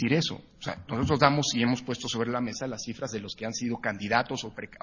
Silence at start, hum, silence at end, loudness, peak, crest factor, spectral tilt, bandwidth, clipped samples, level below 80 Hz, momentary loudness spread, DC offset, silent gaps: 0 s; none; 0.05 s; -29 LUFS; -4 dBFS; 26 dB; -4.5 dB/octave; 7.4 kHz; under 0.1%; -52 dBFS; 12 LU; under 0.1%; none